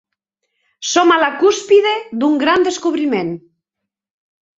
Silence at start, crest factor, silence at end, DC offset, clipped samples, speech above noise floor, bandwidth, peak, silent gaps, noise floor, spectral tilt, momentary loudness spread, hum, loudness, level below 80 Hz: 0.8 s; 16 dB; 1.2 s; under 0.1%; under 0.1%; 67 dB; 7.8 kHz; 0 dBFS; none; -81 dBFS; -3 dB/octave; 10 LU; none; -14 LUFS; -62 dBFS